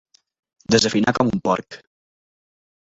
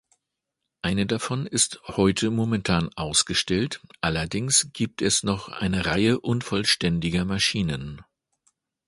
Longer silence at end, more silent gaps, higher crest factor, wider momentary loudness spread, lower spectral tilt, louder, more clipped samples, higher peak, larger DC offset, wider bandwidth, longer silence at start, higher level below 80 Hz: first, 1.1 s vs 0.85 s; neither; about the same, 22 dB vs 20 dB; first, 19 LU vs 7 LU; about the same, -4.5 dB/octave vs -3.5 dB/octave; first, -19 LUFS vs -24 LUFS; neither; first, -2 dBFS vs -6 dBFS; neither; second, 8 kHz vs 11.5 kHz; second, 0.7 s vs 0.85 s; second, -54 dBFS vs -46 dBFS